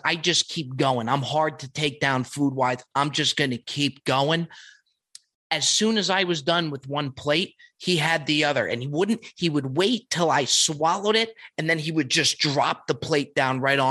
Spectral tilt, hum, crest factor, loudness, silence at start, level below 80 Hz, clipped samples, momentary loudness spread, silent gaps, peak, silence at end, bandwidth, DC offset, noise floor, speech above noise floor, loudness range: -3.5 dB/octave; none; 18 dB; -23 LUFS; 0.05 s; -66 dBFS; under 0.1%; 7 LU; 5.35-5.50 s; -6 dBFS; 0 s; 12.5 kHz; under 0.1%; -53 dBFS; 29 dB; 2 LU